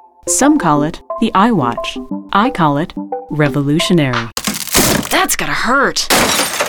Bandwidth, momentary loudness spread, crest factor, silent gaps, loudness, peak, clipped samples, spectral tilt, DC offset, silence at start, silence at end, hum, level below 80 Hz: 19.5 kHz; 9 LU; 14 dB; none; -14 LUFS; 0 dBFS; under 0.1%; -3.5 dB/octave; under 0.1%; 0.25 s; 0 s; none; -36 dBFS